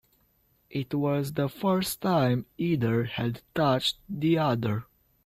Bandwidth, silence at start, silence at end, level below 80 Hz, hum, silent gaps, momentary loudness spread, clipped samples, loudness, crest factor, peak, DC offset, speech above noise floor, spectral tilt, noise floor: 16 kHz; 0.7 s; 0.4 s; -60 dBFS; none; none; 7 LU; under 0.1%; -28 LUFS; 16 dB; -12 dBFS; under 0.1%; 41 dB; -6 dB/octave; -67 dBFS